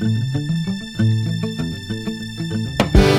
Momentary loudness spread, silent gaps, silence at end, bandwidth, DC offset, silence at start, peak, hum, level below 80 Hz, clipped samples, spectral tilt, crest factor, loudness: 9 LU; none; 0 s; 15.5 kHz; under 0.1%; 0 s; 0 dBFS; none; -26 dBFS; under 0.1%; -6.5 dB/octave; 18 dB; -21 LUFS